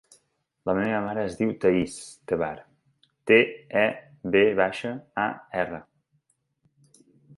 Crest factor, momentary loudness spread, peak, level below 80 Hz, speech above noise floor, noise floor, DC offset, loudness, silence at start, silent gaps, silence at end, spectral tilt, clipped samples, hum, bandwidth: 22 dB; 15 LU; -6 dBFS; -60 dBFS; 47 dB; -72 dBFS; under 0.1%; -25 LUFS; 0.65 s; none; 1.55 s; -5.5 dB/octave; under 0.1%; none; 11.5 kHz